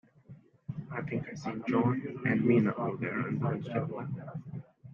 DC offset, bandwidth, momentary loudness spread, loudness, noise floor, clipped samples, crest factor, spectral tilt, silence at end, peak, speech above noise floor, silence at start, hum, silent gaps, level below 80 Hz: under 0.1%; 7.2 kHz; 16 LU; -32 LUFS; -55 dBFS; under 0.1%; 18 dB; -9 dB/octave; 0 s; -14 dBFS; 24 dB; 0.3 s; none; none; -70 dBFS